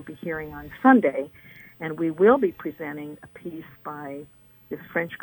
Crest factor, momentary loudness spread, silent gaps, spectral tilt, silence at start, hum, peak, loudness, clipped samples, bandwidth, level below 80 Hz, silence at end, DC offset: 22 dB; 20 LU; none; -8.5 dB/octave; 0 s; none; -2 dBFS; -23 LUFS; under 0.1%; 19 kHz; -60 dBFS; 0.05 s; under 0.1%